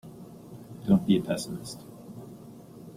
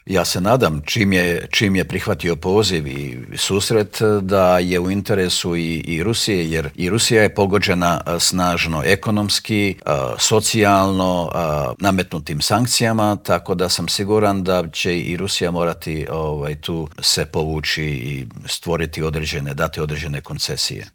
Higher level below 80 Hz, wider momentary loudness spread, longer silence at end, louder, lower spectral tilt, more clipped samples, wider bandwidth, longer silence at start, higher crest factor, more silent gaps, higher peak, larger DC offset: second, -60 dBFS vs -42 dBFS; first, 23 LU vs 9 LU; about the same, 0 s vs 0.05 s; second, -27 LUFS vs -18 LUFS; first, -6.5 dB/octave vs -4 dB/octave; neither; second, 15.5 kHz vs over 20 kHz; about the same, 0.05 s vs 0.05 s; about the same, 20 dB vs 18 dB; neither; second, -10 dBFS vs 0 dBFS; neither